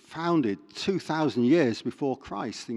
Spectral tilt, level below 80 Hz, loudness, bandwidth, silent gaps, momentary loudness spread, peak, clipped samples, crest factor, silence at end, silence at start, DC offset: -6 dB/octave; -64 dBFS; -27 LUFS; 11 kHz; none; 10 LU; -10 dBFS; under 0.1%; 16 dB; 0 s; 0.1 s; under 0.1%